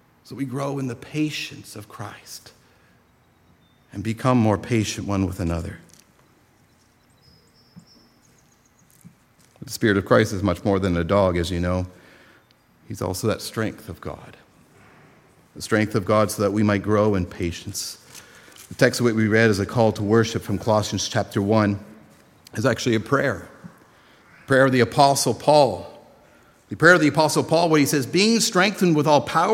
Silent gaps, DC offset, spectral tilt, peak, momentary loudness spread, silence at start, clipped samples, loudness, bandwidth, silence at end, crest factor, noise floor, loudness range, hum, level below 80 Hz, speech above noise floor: none; under 0.1%; -5 dB/octave; 0 dBFS; 18 LU; 0.3 s; under 0.1%; -21 LUFS; 16.5 kHz; 0 s; 22 dB; -58 dBFS; 12 LU; none; -54 dBFS; 38 dB